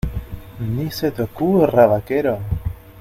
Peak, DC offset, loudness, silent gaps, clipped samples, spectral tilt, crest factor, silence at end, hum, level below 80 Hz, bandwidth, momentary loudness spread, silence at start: 0 dBFS; under 0.1%; -19 LUFS; none; under 0.1%; -7.5 dB/octave; 18 dB; 0 s; none; -34 dBFS; 16 kHz; 16 LU; 0.05 s